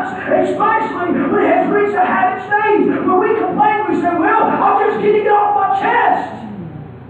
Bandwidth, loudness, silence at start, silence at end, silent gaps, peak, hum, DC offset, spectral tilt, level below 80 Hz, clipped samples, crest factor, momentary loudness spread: 8.4 kHz; -14 LUFS; 0 s; 0 s; none; -2 dBFS; none; under 0.1%; -7.5 dB/octave; -52 dBFS; under 0.1%; 12 dB; 5 LU